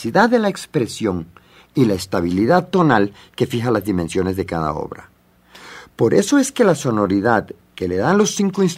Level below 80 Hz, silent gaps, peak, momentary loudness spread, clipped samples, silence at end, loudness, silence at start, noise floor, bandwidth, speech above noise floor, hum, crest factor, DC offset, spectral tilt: -50 dBFS; none; 0 dBFS; 13 LU; under 0.1%; 0 s; -18 LUFS; 0 s; -47 dBFS; 16 kHz; 30 dB; none; 18 dB; under 0.1%; -5.5 dB/octave